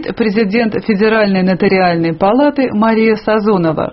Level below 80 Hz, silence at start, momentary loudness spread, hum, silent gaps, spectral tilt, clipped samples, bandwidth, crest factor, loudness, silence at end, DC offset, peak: -44 dBFS; 0 s; 3 LU; none; none; -5.5 dB/octave; under 0.1%; 5.8 kHz; 12 dB; -12 LUFS; 0 s; under 0.1%; 0 dBFS